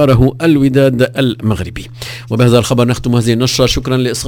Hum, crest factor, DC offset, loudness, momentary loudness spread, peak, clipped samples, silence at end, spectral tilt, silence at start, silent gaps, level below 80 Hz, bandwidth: none; 12 dB; under 0.1%; -12 LUFS; 11 LU; 0 dBFS; 0.3%; 0 s; -6 dB/octave; 0 s; none; -30 dBFS; 16 kHz